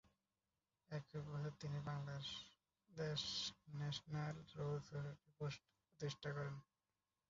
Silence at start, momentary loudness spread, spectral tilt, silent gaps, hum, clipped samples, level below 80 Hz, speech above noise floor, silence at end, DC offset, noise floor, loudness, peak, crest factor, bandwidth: 0.9 s; 9 LU; -4.5 dB/octave; none; none; under 0.1%; -76 dBFS; over 42 dB; 0.65 s; under 0.1%; under -90 dBFS; -49 LUFS; -34 dBFS; 16 dB; 7.4 kHz